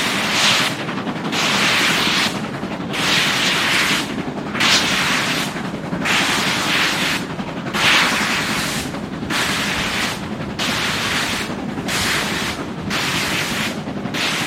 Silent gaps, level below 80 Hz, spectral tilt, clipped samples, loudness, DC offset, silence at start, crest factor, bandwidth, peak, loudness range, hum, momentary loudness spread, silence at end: none; -46 dBFS; -2.5 dB/octave; under 0.1%; -18 LUFS; under 0.1%; 0 s; 18 dB; 16.5 kHz; -2 dBFS; 4 LU; none; 11 LU; 0 s